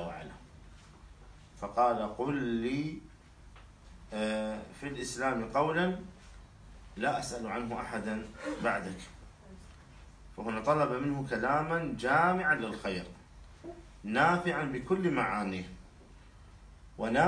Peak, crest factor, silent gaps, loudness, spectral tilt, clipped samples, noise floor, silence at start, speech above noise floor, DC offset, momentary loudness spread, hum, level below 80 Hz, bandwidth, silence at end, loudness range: -14 dBFS; 20 dB; none; -32 LUFS; -5.5 dB/octave; under 0.1%; -55 dBFS; 0 s; 23 dB; under 0.1%; 21 LU; none; -56 dBFS; 10.5 kHz; 0 s; 6 LU